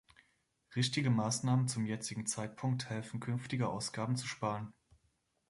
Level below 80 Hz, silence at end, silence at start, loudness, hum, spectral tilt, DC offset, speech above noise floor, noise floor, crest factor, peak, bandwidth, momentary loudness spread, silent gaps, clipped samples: -70 dBFS; 0.8 s; 0.7 s; -36 LUFS; none; -5 dB/octave; under 0.1%; 42 dB; -78 dBFS; 16 dB; -20 dBFS; 11.5 kHz; 8 LU; none; under 0.1%